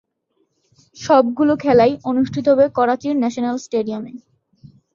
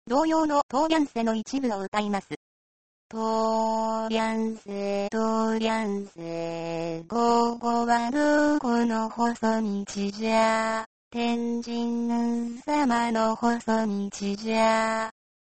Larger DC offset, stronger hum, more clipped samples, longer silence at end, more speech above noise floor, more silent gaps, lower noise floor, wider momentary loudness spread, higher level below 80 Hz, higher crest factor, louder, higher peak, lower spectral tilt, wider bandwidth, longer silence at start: second, under 0.1% vs 0.3%; neither; neither; first, 0.75 s vs 0.35 s; second, 51 dB vs over 65 dB; second, none vs 0.63-0.69 s, 1.88-1.92 s, 2.37-3.10 s, 10.86-11.11 s; second, -67 dBFS vs under -90 dBFS; about the same, 11 LU vs 9 LU; about the same, -56 dBFS vs -60 dBFS; about the same, 16 dB vs 16 dB; first, -17 LUFS vs -26 LUFS; first, -2 dBFS vs -8 dBFS; about the same, -6 dB/octave vs -5 dB/octave; second, 7.6 kHz vs 8.8 kHz; first, 0.95 s vs 0.05 s